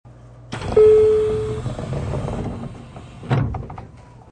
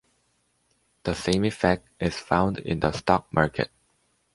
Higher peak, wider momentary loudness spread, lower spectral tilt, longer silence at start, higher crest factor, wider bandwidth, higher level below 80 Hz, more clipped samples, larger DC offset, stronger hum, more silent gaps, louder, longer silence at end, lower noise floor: about the same, -4 dBFS vs -2 dBFS; first, 24 LU vs 8 LU; first, -7.5 dB/octave vs -6 dB/octave; second, 0.05 s vs 1.05 s; second, 16 dB vs 24 dB; second, 9.6 kHz vs 11.5 kHz; first, -36 dBFS vs -46 dBFS; neither; neither; neither; neither; first, -19 LUFS vs -26 LUFS; second, 0.3 s vs 0.7 s; second, -42 dBFS vs -70 dBFS